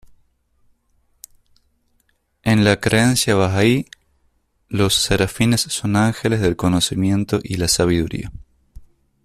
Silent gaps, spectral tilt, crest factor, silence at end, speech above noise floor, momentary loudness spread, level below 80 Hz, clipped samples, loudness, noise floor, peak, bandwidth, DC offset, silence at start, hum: none; -4.5 dB/octave; 18 dB; 0.4 s; 47 dB; 8 LU; -42 dBFS; under 0.1%; -18 LUFS; -64 dBFS; -2 dBFS; 14.5 kHz; under 0.1%; 2.45 s; none